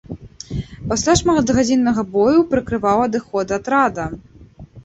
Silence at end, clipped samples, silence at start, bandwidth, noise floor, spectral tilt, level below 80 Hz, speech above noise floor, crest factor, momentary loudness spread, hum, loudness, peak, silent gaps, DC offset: 0.05 s; under 0.1%; 0.1 s; 8.2 kHz; -41 dBFS; -5 dB/octave; -40 dBFS; 24 dB; 16 dB; 14 LU; none; -17 LUFS; -2 dBFS; none; under 0.1%